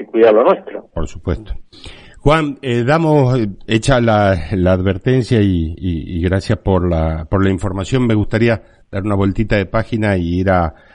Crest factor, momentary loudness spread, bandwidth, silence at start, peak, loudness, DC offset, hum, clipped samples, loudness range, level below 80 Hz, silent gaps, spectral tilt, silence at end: 14 dB; 11 LU; 10.5 kHz; 0 s; 0 dBFS; -16 LUFS; under 0.1%; none; under 0.1%; 2 LU; -30 dBFS; none; -7.5 dB/octave; 0.2 s